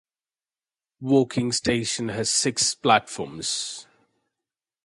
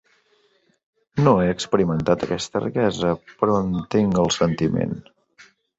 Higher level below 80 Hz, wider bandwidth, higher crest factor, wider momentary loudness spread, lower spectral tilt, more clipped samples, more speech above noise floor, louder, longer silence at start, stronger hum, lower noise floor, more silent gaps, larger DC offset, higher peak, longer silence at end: second, -58 dBFS vs -48 dBFS; first, 11.5 kHz vs 8 kHz; about the same, 22 dB vs 18 dB; first, 13 LU vs 6 LU; second, -3 dB/octave vs -6 dB/octave; neither; first, over 66 dB vs 43 dB; about the same, -23 LUFS vs -21 LUFS; second, 1 s vs 1.15 s; neither; first, under -90 dBFS vs -63 dBFS; neither; neither; about the same, -4 dBFS vs -4 dBFS; first, 1 s vs 0.8 s